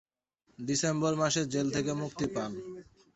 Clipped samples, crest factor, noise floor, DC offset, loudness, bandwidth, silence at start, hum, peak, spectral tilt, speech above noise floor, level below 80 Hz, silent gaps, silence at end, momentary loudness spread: under 0.1%; 18 dB; -73 dBFS; under 0.1%; -31 LUFS; 8.2 kHz; 0.6 s; none; -14 dBFS; -4.5 dB/octave; 41 dB; -62 dBFS; none; 0.35 s; 14 LU